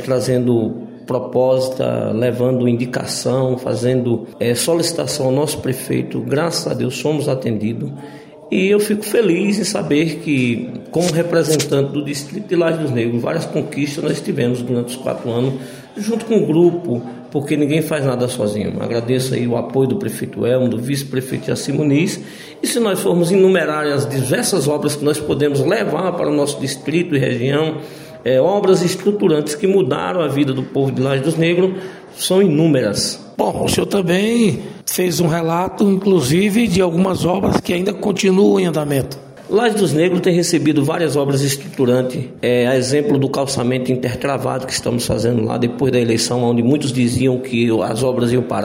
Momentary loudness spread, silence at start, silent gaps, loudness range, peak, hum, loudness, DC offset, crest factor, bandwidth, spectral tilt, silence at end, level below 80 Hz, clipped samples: 7 LU; 0 s; none; 3 LU; -2 dBFS; none; -17 LUFS; under 0.1%; 16 dB; 16 kHz; -5.5 dB/octave; 0 s; -50 dBFS; under 0.1%